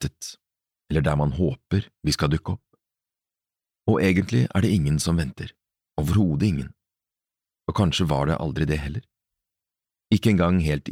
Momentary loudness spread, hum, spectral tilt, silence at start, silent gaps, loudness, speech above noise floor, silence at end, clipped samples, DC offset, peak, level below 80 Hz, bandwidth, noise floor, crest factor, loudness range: 14 LU; none; -6 dB/octave; 0 s; none; -23 LUFS; over 68 dB; 0 s; under 0.1%; under 0.1%; -6 dBFS; -40 dBFS; 15.5 kHz; under -90 dBFS; 18 dB; 3 LU